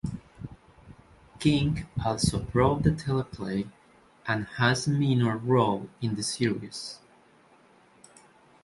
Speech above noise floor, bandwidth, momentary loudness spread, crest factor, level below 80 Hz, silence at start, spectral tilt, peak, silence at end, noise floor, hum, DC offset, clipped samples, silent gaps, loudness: 32 dB; 11.5 kHz; 16 LU; 20 dB; -48 dBFS; 0.05 s; -5.5 dB/octave; -8 dBFS; 1.65 s; -59 dBFS; none; under 0.1%; under 0.1%; none; -27 LUFS